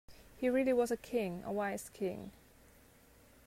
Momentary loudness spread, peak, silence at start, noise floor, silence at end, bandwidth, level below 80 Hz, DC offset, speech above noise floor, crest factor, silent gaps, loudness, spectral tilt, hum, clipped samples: 9 LU; -22 dBFS; 0.1 s; -63 dBFS; 1.15 s; 16 kHz; -66 dBFS; under 0.1%; 28 dB; 16 dB; none; -36 LUFS; -5.5 dB/octave; none; under 0.1%